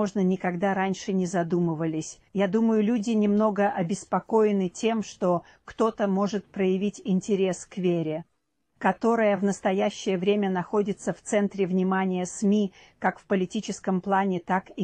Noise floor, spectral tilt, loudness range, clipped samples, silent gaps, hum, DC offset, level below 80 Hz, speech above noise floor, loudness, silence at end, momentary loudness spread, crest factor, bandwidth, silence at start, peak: -74 dBFS; -6.5 dB/octave; 2 LU; under 0.1%; none; none; under 0.1%; -64 dBFS; 49 dB; -26 LUFS; 0 s; 7 LU; 18 dB; 9.6 kHz; 0 s; -8 dBFS